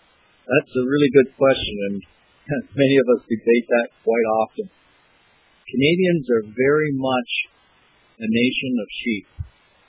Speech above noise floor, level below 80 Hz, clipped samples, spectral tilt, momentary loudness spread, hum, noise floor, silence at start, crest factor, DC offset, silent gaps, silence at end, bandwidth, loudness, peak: 38 dB; -50 dBFS; under 0.1%; -10 dB/octave; 12 LU; none; -58 dBFS; 0.5 s; 20 dB; under 0.1%; none; 0.45 s; 4 kHz; -20 LUFS; -2 dBFS